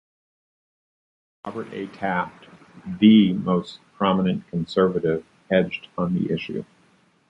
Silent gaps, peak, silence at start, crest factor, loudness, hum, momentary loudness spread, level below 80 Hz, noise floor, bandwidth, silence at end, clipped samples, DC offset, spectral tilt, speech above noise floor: none; -4 dBFS; 1.45 s; 20 dB; -22 LUFS; none; 18 LU; -56 dBFS; -60 dBFS; 7.6 kHz; 0.65 s; under 0.1%; under 0.1%; -8 dB/octave; 38 dB